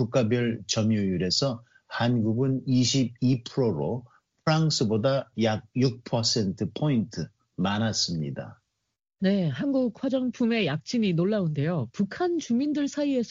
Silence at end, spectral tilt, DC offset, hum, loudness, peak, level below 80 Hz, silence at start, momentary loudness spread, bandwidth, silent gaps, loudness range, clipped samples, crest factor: 0 s; -5.5 dB/octave; under 0.1%; none; -26 LUFS; -12 dBFS; -62 dBFS; 0 s; 7 LU; 7.6 kHz; none; 3 LU; under 0.1%; 14 dB